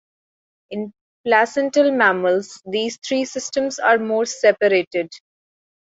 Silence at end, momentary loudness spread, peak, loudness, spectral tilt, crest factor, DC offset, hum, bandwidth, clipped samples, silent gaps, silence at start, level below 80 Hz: 0.75 s; 14 LU; -2 dBFS; -19 LUFS; -3.5 dB/octave; 20 dB; under 0.1%; none; 8 kHz; under 0.1%; 1.01-1.24 s, 4.87-4.91 s; 0.7 s; -68 dBFS